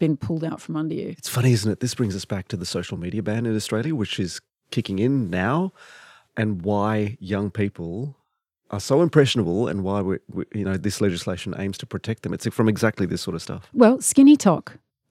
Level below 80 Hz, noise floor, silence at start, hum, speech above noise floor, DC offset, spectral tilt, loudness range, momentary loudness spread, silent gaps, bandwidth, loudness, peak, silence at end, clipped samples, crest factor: -62 dBFS; -73 dBFS; 0 s; none; 51 dB; under 0.1%; -5.5 dB/octave; 7 LU; 13 LU; none; 15.5 kHz; -23 LUFS; -2 dBFS; 0.4 s; under 0.1%; 20 dB